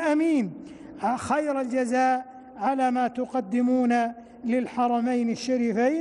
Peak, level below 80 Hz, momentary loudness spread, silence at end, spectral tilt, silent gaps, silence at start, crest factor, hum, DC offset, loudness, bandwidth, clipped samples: -14 dBFS; -66 dBFS; 8 LU; 0 s; -5.5 dB/octave; none; 0 s; 12 dB; none; under 0.1%; -25 LUFS; 11.5 kHz; under 0.1%